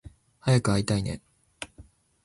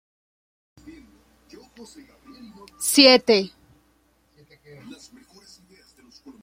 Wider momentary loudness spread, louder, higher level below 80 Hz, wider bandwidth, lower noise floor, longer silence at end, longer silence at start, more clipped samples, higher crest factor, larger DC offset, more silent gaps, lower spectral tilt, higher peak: second, 19 LU vs 29 LU; second, -26 LUFS vs -16 LUFS; first, -50 dBFS vs -64 dBFS; second, 11.5 kHz vs 16.5 kHz; second, -54 dBFS vs -63 dBFS; second, 0.45 s vs 2.95 s; second, 0.45 s vs 2.8 s; neither; about the same, 20 dB vs 24 dB; neither; neither; first, -6 dB/octave vs -2 dB/octave; second, -10 dBFS vs -2 dBFS